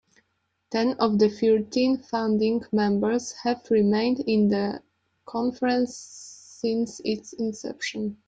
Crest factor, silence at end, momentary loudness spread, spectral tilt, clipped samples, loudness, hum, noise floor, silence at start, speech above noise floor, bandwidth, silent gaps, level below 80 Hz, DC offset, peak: 16 dB; 0.15 s; 10 LU; -5.5 dB/octave; under 0.1%; -25 LUFS; none; -74 dBFS; 0.7 s; 50 dB; 9 kHz; none; -64 dBFS; under 0.1%; -8 dBFS